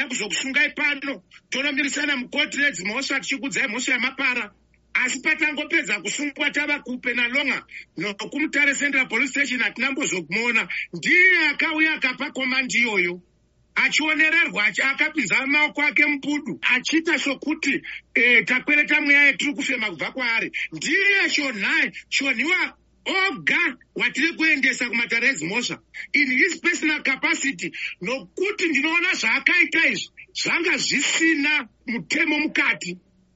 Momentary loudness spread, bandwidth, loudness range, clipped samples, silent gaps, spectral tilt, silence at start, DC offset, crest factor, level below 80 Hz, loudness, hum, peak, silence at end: 10 LU; 8 kHz; 4 LU; under 0.1%; none; -0.5 dB/octave; 0 s; under 0.1%; 22 dB; -64 dBFS; -20 LUFS; none; 0 dBFS; 0.4 s